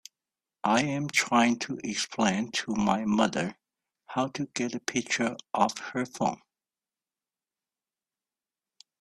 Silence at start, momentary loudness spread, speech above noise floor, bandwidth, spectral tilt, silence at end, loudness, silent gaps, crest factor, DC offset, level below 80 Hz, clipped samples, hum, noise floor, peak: 0.65 s; 9 LU; over 62 dB; 13 kHz; -4 dB/octave; 2.65 s; -28 LUFS; none; 22 dB; under 0.1%; -66 dBFS; under 0.1%; none; under -90 dBFS; -8 dBFS